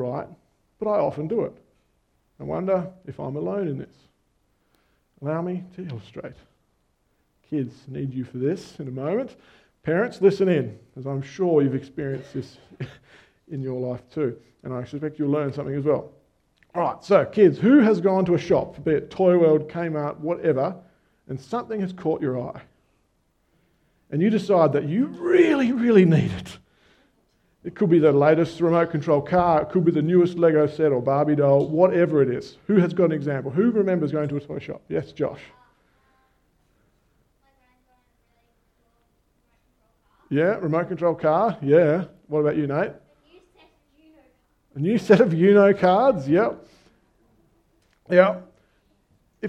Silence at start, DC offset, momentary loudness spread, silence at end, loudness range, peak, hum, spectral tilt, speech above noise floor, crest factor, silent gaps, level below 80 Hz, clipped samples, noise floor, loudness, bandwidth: 0 s; under 0.1%; 18 LU; 0 s; 12 LU; -2 dBFS; none; -8.5 dB/octave; 47 dB; 22 dB; none; -60 dBFS; under 0.1%; -68 dBFS; -22 LUFS; 9 kHz